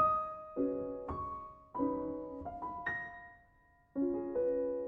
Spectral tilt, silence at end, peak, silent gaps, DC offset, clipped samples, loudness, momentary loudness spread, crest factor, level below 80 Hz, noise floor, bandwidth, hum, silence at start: -9 dB/octave; 0 s; -20 dBFS; none; under 0.1%; under 0.1%; -38 LUFS; 11 LU; 18 dB; -60 dBFS; -67 dBFS; 4 kHz; none; 0 s